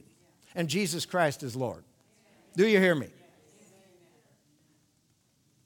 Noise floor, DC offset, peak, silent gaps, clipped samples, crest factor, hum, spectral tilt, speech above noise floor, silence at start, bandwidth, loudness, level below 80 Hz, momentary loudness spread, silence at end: -70 dBFS; under 0.1%; -10 dBFS; none; under 0.1%; 22 dB; none; -5 dB/octave; 42 dB; 0.55 s; 19.5 kHz; -28 LUFS; -74 dBFS; 17 LU; 2.55 s